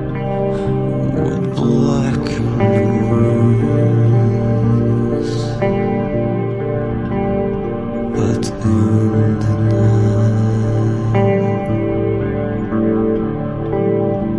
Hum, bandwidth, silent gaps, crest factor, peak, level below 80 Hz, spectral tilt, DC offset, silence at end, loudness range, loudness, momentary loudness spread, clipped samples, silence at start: none; 10.5 kHz; none; 14 dB; -2 dBFS; -34 dBFS; -8.5 dB/octave; under 0.1%; 0 s; 4 LU; -16 LUFS; 6 LU; under 0.1%; 0 s